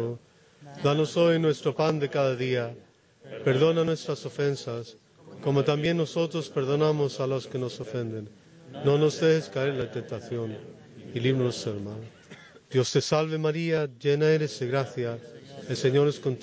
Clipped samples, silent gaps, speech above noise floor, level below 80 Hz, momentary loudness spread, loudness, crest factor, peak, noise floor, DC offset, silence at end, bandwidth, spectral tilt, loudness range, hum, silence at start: under 0.1%; none; 28 dB; -66 dBFS; 16 LU; -27 LUFS; 16 dB; -12 dBFS; -54 dBFS; under 0.1%; 0 s; 8 kHz; -6 dB/octave; 3 LU; none; 0 s